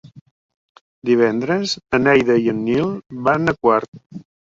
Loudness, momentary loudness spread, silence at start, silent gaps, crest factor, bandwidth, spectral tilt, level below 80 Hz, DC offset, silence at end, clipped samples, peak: -18 LUFS; 9 LU; 0.05 s; 0.21-0.49 s, 0.56-0.75 s, 0.81-1.02 s, 3.88-3.92 s, 4.06-4.10 s; 18 dB; 7.8 kHz; -6 dB/octave; -54 dBFS; under 0.1%; 0.3 s; under 0.1%; -2 dBFS